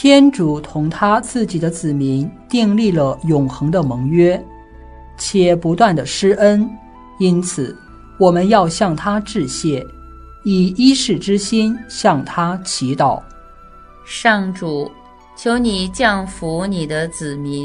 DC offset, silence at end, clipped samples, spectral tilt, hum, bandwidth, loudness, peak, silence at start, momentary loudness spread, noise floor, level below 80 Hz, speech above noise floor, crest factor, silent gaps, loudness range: under 0.1%; 0 s; under 0.1%; -5.5 dB/octave; none; 11 kHz; -16 LUFS; 0 dBFS; 0 s; 11 LU; -40 dBFS; -42 dBFS; 25 dB; 16 dB; none; 4 LU